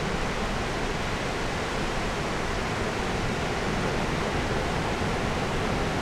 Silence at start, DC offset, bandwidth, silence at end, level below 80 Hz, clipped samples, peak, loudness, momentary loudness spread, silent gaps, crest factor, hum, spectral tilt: 0 s; under 0.1%; 15.5 kHz; 0 s; -36 dBFS; under 0.1%; -14 dBFS; -28 LUFS; 2 LU; none; 14 dB; none; -5 dB/octave